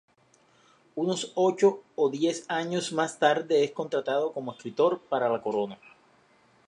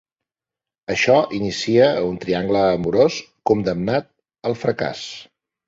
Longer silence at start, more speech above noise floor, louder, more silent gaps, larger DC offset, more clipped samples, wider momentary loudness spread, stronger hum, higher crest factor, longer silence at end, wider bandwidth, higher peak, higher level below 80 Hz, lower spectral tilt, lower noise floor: about the same, 0.95 s vs 0.9 s; second, 37 dB vs 70 dB; second, -27 LUFS vs -19 LUFS; neither; neither; neither; second, 9 LU vs 12 LU; neither; about the same, 20 dB vs 18 dB; first, 0.9 s vs 0.45 s; first, 11 kHz vs 7.8 kHz; second, -8 dBFS vs -2 dBFS; second, -80 dBFS vs -52 dBFS; about the same, -4.5 dB/octave vs -5.5 dB/octave; second, -63 dBFS vs -89 dBFS